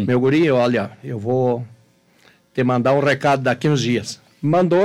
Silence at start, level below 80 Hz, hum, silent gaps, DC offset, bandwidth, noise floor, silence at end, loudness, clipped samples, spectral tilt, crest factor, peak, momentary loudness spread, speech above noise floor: 0 s; -60 dBFS; none; none; under 0.1%; 13 kHz; -55 dBFS; 0 s; -19 LUFS; under 0.1%; -6.5 dB/octave; 12 dB; -6 dBFS; 12 LU; 38 dB